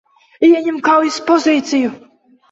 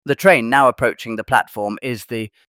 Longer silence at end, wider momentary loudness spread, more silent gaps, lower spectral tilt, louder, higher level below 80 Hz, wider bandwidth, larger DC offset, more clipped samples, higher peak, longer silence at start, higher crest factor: first, 0.55 s vs 0.25 s; second, 6 LU vs 13 LU; neither; second, -3.5 dB/octave vs -5 dB/octave; first, -14 LUFS vs -17 LUFS; second, -62 dBFS vs -52 dBFS; second, 8 kHz vs 16.5 kHz; neither; neither; about the same, -2 dBFS vs 0 dBFS; first, 0.4 s vs 0.05 s; about the same, 14 dB vs 16 dB